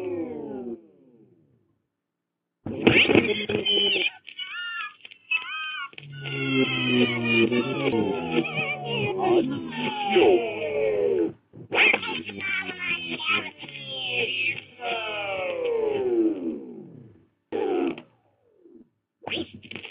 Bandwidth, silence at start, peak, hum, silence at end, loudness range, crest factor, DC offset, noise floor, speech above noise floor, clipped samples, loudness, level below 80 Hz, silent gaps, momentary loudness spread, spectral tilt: 5.2 kHz; 0 s; -2 dBFS; none; 0 s; 6 LU; 24 dB; under 0.1%; -83 dBFS; 60 dB; under 0.1%; -24 LUFS; -62 dBFS; none; 17 LU; -8.5 dB/octave